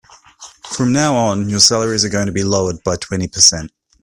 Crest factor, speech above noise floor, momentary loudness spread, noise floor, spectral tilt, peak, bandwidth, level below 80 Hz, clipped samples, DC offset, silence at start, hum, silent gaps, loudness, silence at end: 16 dB; 26 dB; 11 LU; -41 dBFS; -3 dB/octave; 0 dBFS; 16 kHz; -46 dBFS; under 0.1%; under 0.1%; 0.4 s; none; none; -14 LUFS; 0.35 s